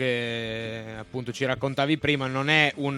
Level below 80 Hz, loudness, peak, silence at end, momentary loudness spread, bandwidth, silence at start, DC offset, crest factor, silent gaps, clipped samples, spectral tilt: -56 dBFS; -25 LUFS; -6 dBFS; 0 s; 14 LU; 13 kHz; 0 s; under 0.1%; 20 dB; none; under 0.1%; -5.5 dB/octave